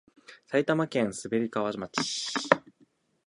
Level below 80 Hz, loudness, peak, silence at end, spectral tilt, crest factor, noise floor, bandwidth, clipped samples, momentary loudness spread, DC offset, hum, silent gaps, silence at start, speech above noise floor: -68 dBFS; -29 LUFS; 0 dBFS; 0.65 s; -4 dB/octave; 30 dB; -66 dBFS; 11.5 kHz; under 0.1%; 5 LU; under 0.1%; none; none; 0.3 s; 37 dB